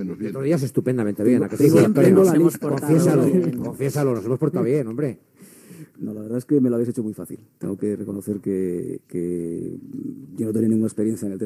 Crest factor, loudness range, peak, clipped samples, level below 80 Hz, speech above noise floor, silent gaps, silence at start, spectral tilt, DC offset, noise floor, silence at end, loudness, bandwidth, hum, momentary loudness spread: 18 dB; 9 LU; -2 dBFS; under 0.1%; -66 dBFS; 25 dB; none; 0 s; -8 dB/octave; under 0.1%; -46 dBFS; 0 s; -21 LUFS; 15 kHz; none; 17 LU